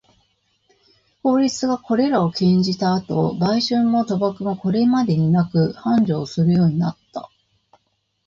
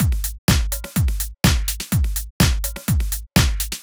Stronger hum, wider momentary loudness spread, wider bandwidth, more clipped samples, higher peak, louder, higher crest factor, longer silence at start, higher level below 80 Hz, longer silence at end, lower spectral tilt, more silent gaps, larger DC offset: neither; about the same, 6 LU vs 5 LU; second, 7.8 kHz vs over 20 kHz; neither; second, -6 dBFS vs -2 dBFS; about the same, -19 LUFS vs -21 LUFS; about the same, 14 dB vs 16 dB; first, 1.25 s vs 0 s; second, -54 dBFS vs -24 dBFS; first, 1 s vs 0 s; first, -7 dB/octave vs -4 dB/octave; second, none vs 0.38-0.48 s, 2.30-2.40 s; neither